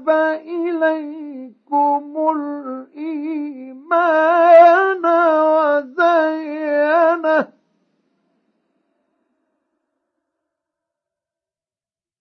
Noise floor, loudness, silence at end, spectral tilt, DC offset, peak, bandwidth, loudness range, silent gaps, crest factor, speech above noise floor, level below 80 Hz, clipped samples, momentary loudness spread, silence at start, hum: under -90 dBFS; -16 LUFS; 4.75 s; -5.5 dB/octave; under 0.1%; 0 dBFS; 6.2 kHz; 8 LU; none; 18 dB; over 72 dB; -84 dBFS; under 0.1%; 19 LU; 0 s; none